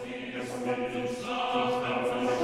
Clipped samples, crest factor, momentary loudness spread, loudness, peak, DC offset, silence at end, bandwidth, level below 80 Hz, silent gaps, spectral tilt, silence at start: under 0.1%; 16 dB; 7 LU; -31 LUFS; -14 dBFS; under 0.1%; 0 s; 14 kHz; -62 dBFS; none; -4.5 dB/octave; 0 s